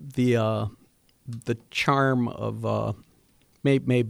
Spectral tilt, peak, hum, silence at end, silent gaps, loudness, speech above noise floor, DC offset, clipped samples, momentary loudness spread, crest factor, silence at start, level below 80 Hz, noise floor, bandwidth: -7 dB/octave; -8 dBFS; none; 0 s; none; -26 LUFS; 37 dB; under 0.1%; under 0.1%; 13 LU; 18 dB; 0 s; -58 dBFS; -62 dBFS; 14.5 kHz